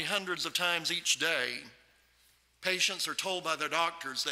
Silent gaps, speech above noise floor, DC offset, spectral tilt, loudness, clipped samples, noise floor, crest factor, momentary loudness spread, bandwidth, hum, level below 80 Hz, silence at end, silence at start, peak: none; 35 dB; under 0.1%; -0.5 dB/octave; -31 LUFS; under 0.1%; -67 dBFS; 22 dB; 6 LU; 16 kHz; none; -76 dBFS; 0 s; 0 s; -12 dBFS